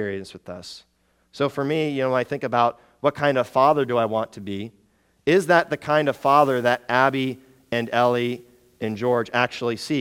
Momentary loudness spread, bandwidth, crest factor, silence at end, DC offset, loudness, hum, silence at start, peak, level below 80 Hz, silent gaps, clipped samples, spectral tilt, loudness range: 16 LU; 17.5 kHz; 20 dB; 0 s; under 0.1%; -22 LUFS; none; 0 s; -2 dBFS; -64 dBFS; none; under 0.1%; -5.5 dB/octave; 3 LU